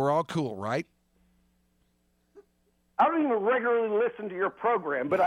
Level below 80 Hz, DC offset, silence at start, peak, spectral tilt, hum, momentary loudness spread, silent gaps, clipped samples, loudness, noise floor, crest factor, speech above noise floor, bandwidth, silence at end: -72 dBFS; under 0.1%; 0 s; -12 dBFS; -7 dB/octave; none; 7 LU; none; under 0.1%; -28 LUFS; -71 dBFS; 16 dB; 44 dB; 11.5 kHz; 0 s